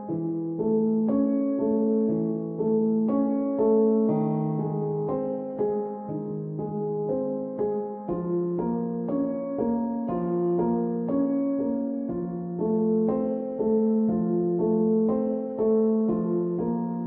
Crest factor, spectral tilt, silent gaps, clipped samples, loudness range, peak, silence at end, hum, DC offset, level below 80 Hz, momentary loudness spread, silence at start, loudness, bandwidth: 14 dB; -14.5 dB/octave; none; under 0.1%; 5 LU; -12 dBFS; 0 s; none; under 0.1%; -60 dBFS; 7 LU; 0 s; -26 LUFS; 2.4 kHz